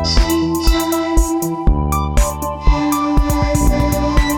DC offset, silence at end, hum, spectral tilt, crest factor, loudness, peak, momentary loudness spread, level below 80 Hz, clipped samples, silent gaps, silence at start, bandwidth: under 0.1%; 0 s; none; -5 dB/octave; 14 dB; -16 LUFS; 0 dBFS; 3 LU; -18 dBFS; under 0.1%; none; 0 s; 19.5 kHz